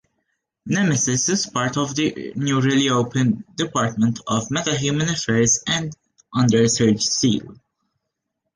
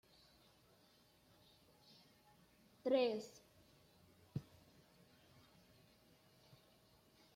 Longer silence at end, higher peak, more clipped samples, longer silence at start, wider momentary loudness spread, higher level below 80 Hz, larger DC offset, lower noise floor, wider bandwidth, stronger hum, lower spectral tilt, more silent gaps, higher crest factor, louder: second, 1 s vs 2.95 s; first, -4 dBFS vs -24 dBFS; neither; second, 0.65 s vs 2.85 s; second, 7 LU vs 31 LU; first, -54 dBFS vs -82 dBFS; neither; first, -78 dBFS vs -72 dBFS; second, 10.5 kHz vs 16.5 kHz; neither; second, -4 dB/octave vs -6 dB/octave; neither; second, 16 dB vs 24 dB; first, -20 LUFS vs -42 LUFS